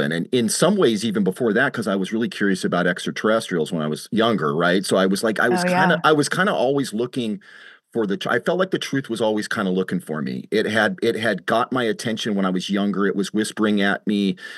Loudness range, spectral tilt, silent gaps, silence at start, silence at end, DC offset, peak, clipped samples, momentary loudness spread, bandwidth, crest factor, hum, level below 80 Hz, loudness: 4 LU; -5 dB/octave; none; 0 s; 0 s; under 0.1%; -2 dBFS; under 0.1%; 7 LU; 12.5 kHz; 18 dB; none; -70 dBFS; -21 LUFS